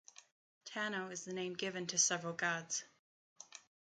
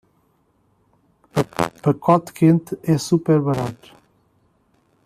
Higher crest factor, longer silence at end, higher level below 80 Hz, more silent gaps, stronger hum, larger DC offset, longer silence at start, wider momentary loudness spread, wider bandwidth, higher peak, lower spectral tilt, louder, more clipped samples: about the same, 24 dB vs 20 dB; second, 0.3 s vs 1.3 s; second, -88 dBFS vs -56 dBFS; first, 2.99-3.36 s vs none; neither; neither; second, 0.65 s vs 1.35 s; first, 22 LU vs 8 LU; second, 10 kHz vs 14.5 kHz; second, -18 dBFS vs -2 dBFS; second, -1.5 dB/octave vs -7 dB/octave; second, -38 LUFS vs -20 LUFS; neither